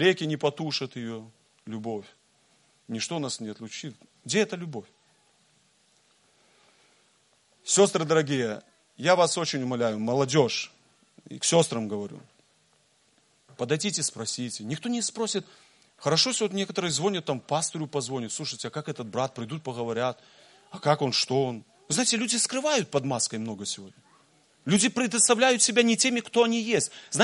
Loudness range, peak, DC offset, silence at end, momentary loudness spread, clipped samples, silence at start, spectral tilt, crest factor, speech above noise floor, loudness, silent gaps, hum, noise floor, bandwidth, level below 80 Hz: 10 LU; -6 dBFS; under 0.1%; 0 s; 16 LU; under 0.1%; 0 s; -3 dB/octave; 22 dB; 39 dB; -26 LUFS; none; none; -66 dBFS; 11.5 kHz; -74 dBFS